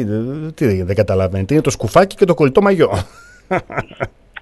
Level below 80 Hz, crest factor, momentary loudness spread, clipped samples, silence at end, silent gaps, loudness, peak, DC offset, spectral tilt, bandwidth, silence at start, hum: -40 dBFS; 16 dB; 14 LU; under 0.1%; 0 s; none; -16 LUFS; 0 dBFS; under 0.1%; -6.5 dB/octave; 12.5 kHz; 0 s; none